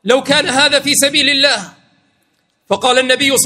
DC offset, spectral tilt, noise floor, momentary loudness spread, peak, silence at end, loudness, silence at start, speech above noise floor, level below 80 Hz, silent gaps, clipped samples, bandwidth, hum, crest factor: under 0.1%; -1.5 dB/octave; -62 dBFS; 6 LU; 0 dBFS; 0 s; -11 LUFS; 0.05 s; 49 dB; -56 dBFS; none; 0.1%; 16.5 kHz; none; 14 dB